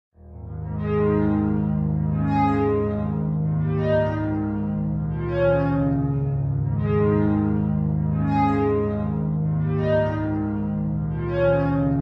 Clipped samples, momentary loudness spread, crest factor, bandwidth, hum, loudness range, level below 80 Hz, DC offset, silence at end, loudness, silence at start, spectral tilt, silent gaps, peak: under 0.1%; 5 LU; 14 dB; 5.4 kHz; none; 1 LU; -36 dBFS; under 0.1%; 0 s; -23 LUFS; 0.25 s; -11 dB/octave; none; -8 dBFS